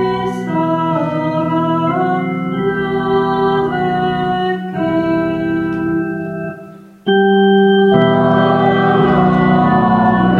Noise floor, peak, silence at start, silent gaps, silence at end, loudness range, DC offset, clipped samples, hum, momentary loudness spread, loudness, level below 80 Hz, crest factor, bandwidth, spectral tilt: -36 dBFS; 0 dBFS; 0 s; none; 0 s; 6 LU; under 0.1%; under 0.1%; none; 8 LU; -14 LUFS; -42 dBFS; 14 dB; 6.8 kHz; -8.5 dB/octave